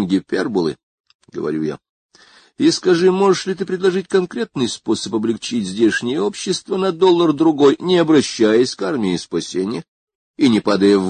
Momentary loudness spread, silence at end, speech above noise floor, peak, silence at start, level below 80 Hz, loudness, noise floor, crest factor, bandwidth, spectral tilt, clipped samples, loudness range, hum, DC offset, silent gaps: 10 LU; 0 s; 33 dB; -2 dBFS; 0 s; -56 dBFS; -17 LUFS; -49 dBFS; 16 dB; 9.6 kHz; -5 dB/octave; under 0.1%; 4 LU; none; under 0.1%; 0.83-1.04 s, 1.15-1.19 s, 1.89-2.09 s, 9.88-10.07 s, 10.15-10.34 s